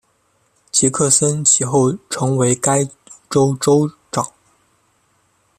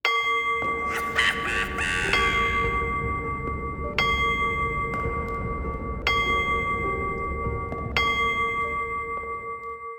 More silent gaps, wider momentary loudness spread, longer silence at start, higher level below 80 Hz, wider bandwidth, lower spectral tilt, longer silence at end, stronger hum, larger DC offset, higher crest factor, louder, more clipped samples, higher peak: neither; about the same, 11 LU vs 9 LU; first, 0.75 s vs 0.05 s; second, -56 dBFS vs -38 dBFS; second, 15 kHz vs over 20 kHz; about the same, -4.5 dB/octave vs -4 dB/octave; first, 1.3 s vs 0 s; neither; neither; about the same, 18 dB vs 20 dB; first, -16 LUFS vs -25 LUFS; neither; first, 0 dBFS vs -6 dBFS